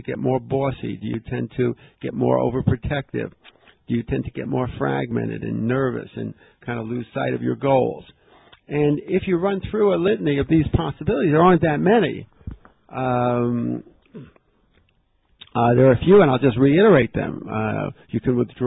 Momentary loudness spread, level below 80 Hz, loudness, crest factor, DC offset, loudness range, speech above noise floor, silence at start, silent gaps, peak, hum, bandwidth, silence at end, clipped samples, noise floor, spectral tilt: 15 LU; -42 dBFS; -21 LUFS; 16 dB; under 0.1%; 8 LU; 44 dB; 0.05 s; none; -4 dBFS; none; 4 kHz; 0 s; under 0.1%; -63 dBFS; -12.5 dB/octave